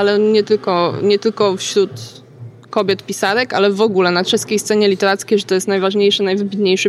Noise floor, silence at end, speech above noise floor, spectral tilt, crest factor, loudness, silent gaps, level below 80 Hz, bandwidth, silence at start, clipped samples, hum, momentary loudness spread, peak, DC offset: -36 dBFS; 0 s; 21 dB; -4 dB/octave; 12 dB; -15 LUFS; none; -66 dBFS; 13.5 kHz; 0 s; under 0.1%; none; 4 LU; -4 dBFS; under 0.1%